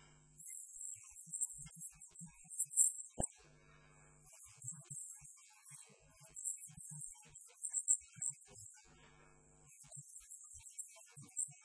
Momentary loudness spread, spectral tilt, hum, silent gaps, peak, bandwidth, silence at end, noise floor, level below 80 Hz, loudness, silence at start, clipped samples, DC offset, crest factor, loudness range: 23 LU; -2 dB/octave; none; none; -16 dBFS; 11 kHz; 0 s; -66 dBFS; -68 dBFS; -41 LUFS; 0 s; under 0.1%; under 0.1%; 30 dB; 10 LU